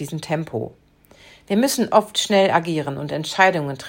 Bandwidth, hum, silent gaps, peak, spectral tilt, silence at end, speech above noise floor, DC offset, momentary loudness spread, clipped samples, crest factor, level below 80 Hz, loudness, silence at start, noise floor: 16.5 kHz; none; none; -2 dBFS; -4 dB/octave; 0 s; 30 dB; under 0.1%; 10 LU; under 0.1%; 20 dB; -60 dBFS; -20 LUFS; 0 s; -50 dBFS